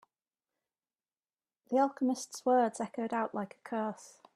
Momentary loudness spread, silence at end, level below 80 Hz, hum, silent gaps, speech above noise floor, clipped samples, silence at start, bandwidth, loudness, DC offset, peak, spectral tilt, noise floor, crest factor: 10 LU; 0.25 s; -86 dBFS; none; none; over 57 dB; under 0.1%; 1.7 s; 13.5 kHz; -33 LUFS; under 0.1%; -16 dBFS; -5 dB/octave; under -90 dBFS; 18 dB